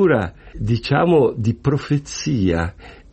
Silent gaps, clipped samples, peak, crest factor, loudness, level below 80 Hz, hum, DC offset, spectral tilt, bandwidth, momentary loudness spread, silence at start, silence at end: none; under 0.1%; -4 dBFS; 14 dB; -19 LUFS; -38 dBFS; none; under 0.1%; -6.5 dB/octave; 8.4 kHz; 10 LU; 0 s; 0.2 s